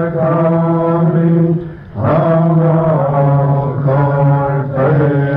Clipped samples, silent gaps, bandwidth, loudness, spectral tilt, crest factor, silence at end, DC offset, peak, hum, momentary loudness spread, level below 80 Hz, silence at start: under 0.1%; none; 3.7 kHz; -13 LUFS; -12 dB/octave; 10 dB; 0 s; under 0.1%; -2 dBFS; none; 4 LU; -42 dBFS; 0 s